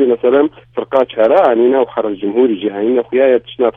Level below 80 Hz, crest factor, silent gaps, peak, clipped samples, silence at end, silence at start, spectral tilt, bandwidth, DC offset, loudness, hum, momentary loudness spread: -56 dBFS; 12 dB; none; 0 dBFS; under 0.1%; 0.05 s; 0 s; -8 dB/octave; 3.9 kHz; under 0.1%; -13 LUFS; none; 7 LU